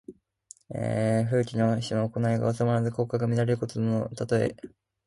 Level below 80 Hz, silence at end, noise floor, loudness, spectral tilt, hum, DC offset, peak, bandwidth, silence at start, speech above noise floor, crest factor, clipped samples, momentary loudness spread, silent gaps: -58 dBFS; 0.4 s; -55 dBFS; -27 LUFS; -7.5 dB/octave; none; under 0.1%; -12 dBFS; 11.5 kHz; 0.1 s; 29 dB; 14 dB; under 0.1%; 6 LU; none